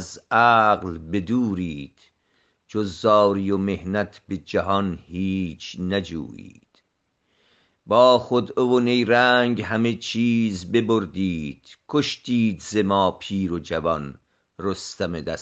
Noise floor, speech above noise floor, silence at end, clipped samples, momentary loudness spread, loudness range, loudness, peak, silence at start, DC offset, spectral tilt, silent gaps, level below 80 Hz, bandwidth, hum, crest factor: -72 dBFS; 50 dB; 0 s; under 0.1%; 14 LU; 7 LU; -22 LUFS; -2 dBFS; 0 s; under 0.1%; -5.5 dB/octave; none; -56 dBFS; 8.4 kHz; none; 20 dB